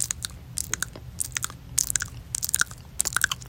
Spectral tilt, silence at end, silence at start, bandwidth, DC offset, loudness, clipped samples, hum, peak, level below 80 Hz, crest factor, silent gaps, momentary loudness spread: 0 dB/octave; 0 s; 0 s; 17 kHz; under 0.1%; -27 LUFS; under 0.1%; none; 0 dBFS; -46 dBFS; 30 dB; none; 8 LU